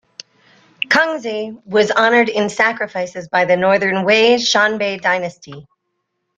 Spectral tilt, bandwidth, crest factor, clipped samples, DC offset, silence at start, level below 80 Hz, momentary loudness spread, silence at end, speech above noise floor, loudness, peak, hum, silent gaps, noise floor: -3.5 dB/octave; 9.2 kHz; 16 dB; under 0.1%; under 0.1%; 0.9 s; -62 dBFS; 11 LU; 0.75 s; 57 dB; -15 LUFS; -2 dBFS; none; none; -73 dBFS